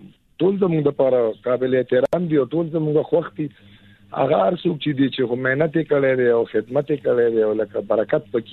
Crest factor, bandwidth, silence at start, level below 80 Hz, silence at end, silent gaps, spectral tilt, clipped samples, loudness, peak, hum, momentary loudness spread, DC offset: 14 dB; 4.3 kHz; 0 s; -60 dBFS; 0 s; none; -9 dB/octave; under 0.1%; -20 LUFS; -4 dBFS; none; 5 LU; under 0.1%